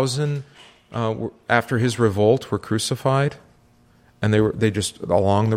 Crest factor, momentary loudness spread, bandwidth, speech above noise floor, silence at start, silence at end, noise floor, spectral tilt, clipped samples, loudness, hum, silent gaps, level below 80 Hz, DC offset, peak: 20 dB; 8 LU; 15.5 kHz; 35 dB; 0 s; 0 s; -55 dBFS; -5.5 dB/octave; under 0.1%; -21 LUFS; none; none; -52 dBFS; under 0.1%; -2 dBFS